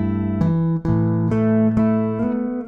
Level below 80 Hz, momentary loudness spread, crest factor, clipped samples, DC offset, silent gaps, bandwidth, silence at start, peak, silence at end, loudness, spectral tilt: -40 dBFS; 5 LU; 12 dB; under 0.1%; under 0.1%; none; 4.1 kHz; 0 s; -6 dBFS; 0 s; -19 LUFS; -11 dB/octave